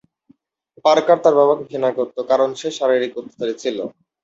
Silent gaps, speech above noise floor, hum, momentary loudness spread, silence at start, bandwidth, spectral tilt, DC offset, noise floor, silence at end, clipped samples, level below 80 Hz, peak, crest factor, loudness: none; 39 dB; none; 12 LU; 0.85 s; 8 kHz; -4.5 dB/octave; under 0.1%; -57 dBFS; 0.35 s; under 0.1%; -68 dBFS; -2 dBFS; 18 dB; -18 LUFS